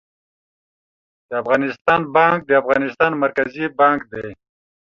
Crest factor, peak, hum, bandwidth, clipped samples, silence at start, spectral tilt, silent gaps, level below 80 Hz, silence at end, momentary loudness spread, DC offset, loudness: 18 dB; 0 dBFS; none; 7 kHz; under 0.1%; 1.3 s; -7 dB/octave; 1.81-1.85 s; -58 dBFS; 0.5 s; 12 LU; under 0.1%; -18 LUFS